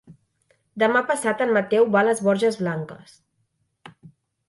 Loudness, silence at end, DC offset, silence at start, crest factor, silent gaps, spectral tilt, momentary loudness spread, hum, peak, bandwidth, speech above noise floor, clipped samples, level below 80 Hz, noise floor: -21 LUFS; 0.4 s; under 0.1%; 0.1 s; 18 dB; none; -5 dB/octave; 11 LU; none; -6 dBFS; 11.5 kHz; 50 dB; under 0.1%; -70 dBFS; -71 dBFS